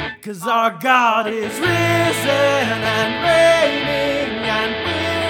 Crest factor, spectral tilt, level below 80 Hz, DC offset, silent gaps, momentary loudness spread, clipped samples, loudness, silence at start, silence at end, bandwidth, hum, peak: 16 dB; -4 dB/octave; -46 dBFS; under 0.1%; none; 7 LU; under 0.1%; -17 LUFS; 0 s; 0 s; 18.5 kHz; none; -2 dBFS